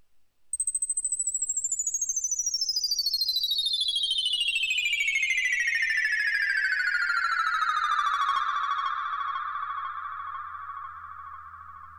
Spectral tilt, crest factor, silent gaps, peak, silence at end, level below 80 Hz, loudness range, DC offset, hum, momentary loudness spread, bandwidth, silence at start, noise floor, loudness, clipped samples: 5 dB/octave; 14 dB; none; -14 dBFS; 0 s; -64 dBFS; 6 LU; under 0.1%; none; 14 LU; over 20 kHz; 0.55 s; -57 dBFS; -25 LUFS; under 0.1%